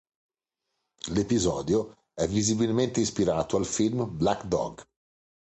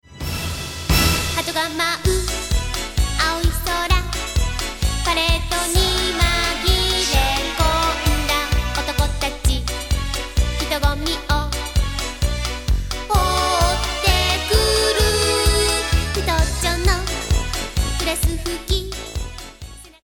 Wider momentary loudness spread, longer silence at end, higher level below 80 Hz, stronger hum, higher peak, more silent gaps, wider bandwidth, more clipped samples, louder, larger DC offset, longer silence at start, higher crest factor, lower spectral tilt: about the same, 6 LU vs 8 LU; first, 0.75 s vs 0.15 s; second, -50 dBFS vs -24 dBFS; neither; second, -10 dBFS vs -2 dBFS; neither; second, 8.8 kHz vs 18 kHz; neither; second, -27 LUFS vs -20 LUFS; second, under 0.1% vs 0.3%; first, 1.05 s vs 0.1 s; about the same, 18 dB vs 18 dB; first, -5 dB/octave vs -3.5 dB/octave